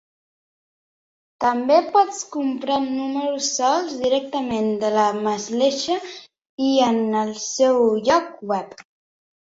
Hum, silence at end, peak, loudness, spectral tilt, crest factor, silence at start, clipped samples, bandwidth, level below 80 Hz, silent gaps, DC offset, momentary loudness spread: none; 0.65 s; -4 dBFS; -21 LUFS; -3.5 dB/octave; 18 dB; 1.4 s; under 0.1%; 8 kHz; -62 dBFS; 6.46-6.58 s; under 0.1%; 9 LU